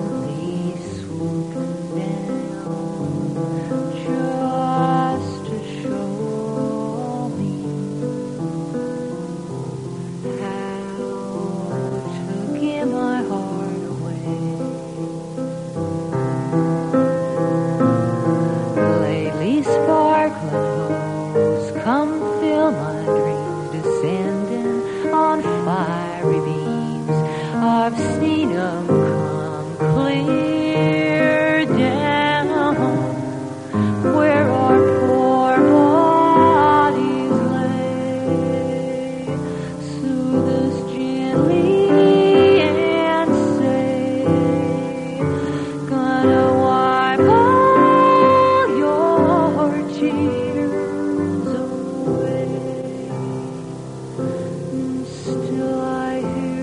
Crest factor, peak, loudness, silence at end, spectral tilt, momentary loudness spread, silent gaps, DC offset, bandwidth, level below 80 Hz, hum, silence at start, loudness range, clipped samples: 16 dB; -2 dBFS; -19 LUFS; 0 s; -7 dB/octave; 13 LU; none; under 0.1%; 10.5 kHz; -54 dBFS; none; 0 s; 11 LU; under 0.1%